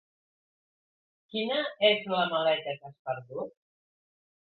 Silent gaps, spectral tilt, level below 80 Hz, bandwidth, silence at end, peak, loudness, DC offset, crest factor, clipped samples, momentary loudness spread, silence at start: 2.99-3.05 s; -7.5 dB/octave; -78 dBFS; 4.6 kHz; 1.1 s; -8 dBFS; -29 LUFS; under 0.1%; 24 dB; under 0.1%; 14 LU; 1.35 s